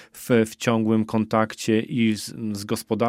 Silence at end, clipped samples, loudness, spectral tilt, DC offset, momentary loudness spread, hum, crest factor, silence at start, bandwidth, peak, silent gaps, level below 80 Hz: 0 s; under 0.1%; -23 LUFS; -5.5 dB/octave; under 0.1%; 8 LU; none; 18 dB; 0 s; 16 kHz; -4 dBFS; none; -62 dBFS